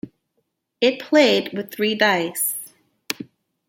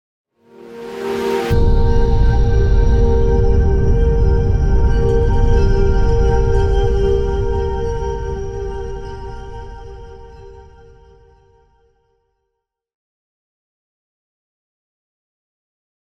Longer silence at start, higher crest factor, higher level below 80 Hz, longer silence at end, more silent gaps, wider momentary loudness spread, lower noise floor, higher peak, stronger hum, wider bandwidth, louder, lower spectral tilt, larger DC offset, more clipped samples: second, 0.05 s vs 0.6 s; first, 22 dB vs 12 dB; second, -70 dBFS vs -18 dBFS; second, 0.45 s vs 5.4 s; neither; about the same, 18 LU vs 17 LU; about the same, -73 dBFS vs -76 dBFS; first, 0 dBFS vs -4 dBFS; neither; first, 17 kHz vs 7 kHz; second, -20 LUFS vs -17 LUFS; second, -3 dB/octave vs -8 dB/octave; neither; neither